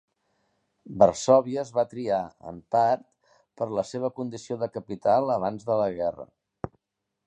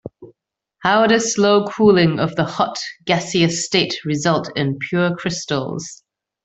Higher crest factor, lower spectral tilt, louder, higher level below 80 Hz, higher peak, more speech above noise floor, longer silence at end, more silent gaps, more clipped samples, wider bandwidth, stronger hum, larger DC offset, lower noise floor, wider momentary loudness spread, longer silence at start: first, 22 dB vs 16 dB; first, -6 dB/octave vs -4.5 dB/octave; second, -26 LUFS vs -18 LUFS; second, -62 dBFS vs -56 dBFS; second, -6 dBFS vs -2 dBFS; first, 58 dB vs 54 dB; about the same, 0.6 s vs 0.5 s; neither; neither; first, 9.8 kHz vs 8.4 kHz; neither; neither; first, -83 dBFS vs -71 dBFS; first, 19 LU vs 9 LU; first, 0.85 s vs 0.05 s